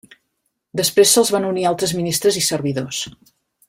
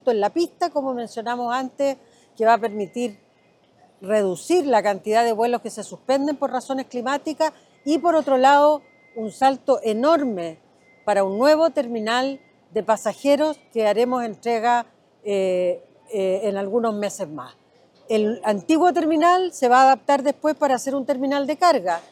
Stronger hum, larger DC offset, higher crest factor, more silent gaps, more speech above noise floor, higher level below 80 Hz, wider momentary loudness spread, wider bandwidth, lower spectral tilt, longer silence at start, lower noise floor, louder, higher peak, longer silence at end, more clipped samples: neither; neither; about the same, 18 dB vs 16 dB; neither; first, 55 dB vs 38 dB; first, -58 dBFS vs -74 dBFS; about the same, 13 LU vs 12 LU; about the same, 16.5 kHz vs 15 kHz; second, -3 dB/octave vs -4.5 dB/octave; first, 0.75 s vs 0.05 s; first, -73 dBFS vs -58 dBFS; first, -17 LUFS vs -21 LUFS; about the same, -2 dBFS vs -4 dBFS; first, 0.6 s vs 0.1 s; neither